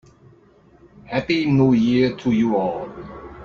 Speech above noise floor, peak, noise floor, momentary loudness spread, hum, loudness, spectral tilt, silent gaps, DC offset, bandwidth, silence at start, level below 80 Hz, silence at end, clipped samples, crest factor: 33 dB; -6 dBFS; -52 dBFS; 17 LU; none; -19 LUFS; -7.5 dB/octave; none; under 0.1%; 7 kHz; 1.05 s; -50 dBFS; 0 s; under 0.1%; 14 dB